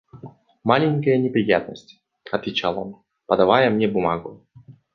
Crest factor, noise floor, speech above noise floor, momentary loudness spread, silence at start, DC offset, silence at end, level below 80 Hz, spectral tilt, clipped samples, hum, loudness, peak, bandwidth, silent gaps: 20 dB; -43 dBFS; 23 dB; 16 LU; 0.15 s; under 0.1%; 0.25 s; -56 dBFS; -7.5 dB/octave; under 0.1%; none; -21 LUFS; -2 dBFS; 6.8 kHz; none